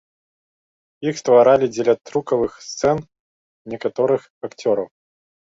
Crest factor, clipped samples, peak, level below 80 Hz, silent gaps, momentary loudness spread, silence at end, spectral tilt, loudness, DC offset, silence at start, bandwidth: 18 dB; under 0.1%; -2 dBFS; -56 dBFS; 3.20-3.65 s, 4.30-4.41 s; 13 LU; 0.55 s; -5.5 dB/octave; -19 LUFS; under 0.1%; 1 s; 7.8 kHz